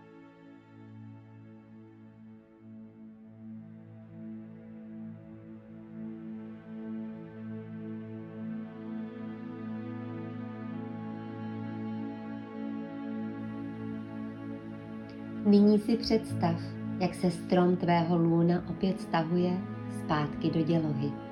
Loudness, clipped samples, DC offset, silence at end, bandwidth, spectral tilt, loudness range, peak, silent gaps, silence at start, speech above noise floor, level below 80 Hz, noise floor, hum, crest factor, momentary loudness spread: -32 LUFS; under 0.1%; under 0.1%; 0 s; 12 kHz; -8 dB/octave; 20 LU; -12 dBFS; none; 0 s; 26 dB; -62 dBFS; -53 dBFS; none; 20 dB; 24 LU